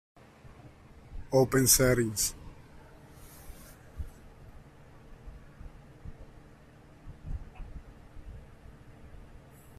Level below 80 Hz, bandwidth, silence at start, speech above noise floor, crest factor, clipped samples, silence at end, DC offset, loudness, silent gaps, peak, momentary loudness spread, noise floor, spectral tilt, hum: -48 dBFS; 16 kHz; 0.45 s; 29 dB; 26 dB; under 0.1%; 0.4 s; under 0.1%; -25 LUFS; none; -10 dBFS; 30 LU; -55 dBFS; -3.5 dB/octave; none